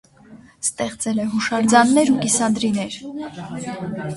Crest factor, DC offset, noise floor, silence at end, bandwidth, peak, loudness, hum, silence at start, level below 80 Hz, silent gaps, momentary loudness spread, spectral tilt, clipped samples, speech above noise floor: 20 dB; under 0.1%; -46 dBFS; 0 s; 11.5 kHz; 0 dBFS; -19 LUFS; none; 0.3 s; -56 dBFS; none; 16 LU; -4 dB/octave; under 0.1%; 26 dB